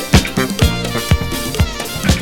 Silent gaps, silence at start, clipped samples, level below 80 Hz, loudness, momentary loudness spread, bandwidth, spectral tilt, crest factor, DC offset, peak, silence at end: none; 0 s; under 0.1%; -22 dBFS; -17 LUFS; 5 LU; 19.5 kHz; -4.5 dB/octave; 16 dB; under 0.1%; 0 dBFS; 0 s